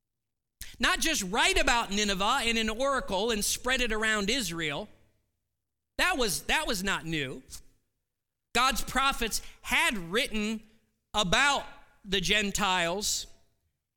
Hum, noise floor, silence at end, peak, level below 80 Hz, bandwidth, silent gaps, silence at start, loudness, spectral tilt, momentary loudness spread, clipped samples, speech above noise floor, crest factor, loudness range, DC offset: none; -87 dBFS; 0.65 s; -10 dBFS; -44 dBFS; 18 kHz; none; 0.6 s; -27 LUFS; -2 dB/octave; 12 LU; under 0.1%; 59 dB; 20 dB; 4 LU; under 0.1%